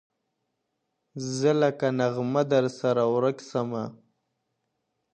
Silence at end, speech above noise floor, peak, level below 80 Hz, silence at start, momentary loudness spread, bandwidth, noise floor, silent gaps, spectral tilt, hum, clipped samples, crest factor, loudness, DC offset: 1.2 s; 54 dB; -10 dBFS; -74 dBFS; 1.15 s; 11 LU; 9.6 kHz; -79 dBFS; none; -6 dB/octave; none; under 0.1%; 18 dB; -26 LUFS; under 0.1%